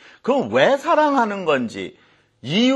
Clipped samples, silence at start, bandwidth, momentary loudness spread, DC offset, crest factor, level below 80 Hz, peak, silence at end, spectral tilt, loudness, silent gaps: under 0.1%; 0.25 s; 11.5 kHz; 16 LU; under 0.1%; 18 dB; -68 dBFS; -2 dBFS; 0 s; -5 dB/octave; -19 LUFS; none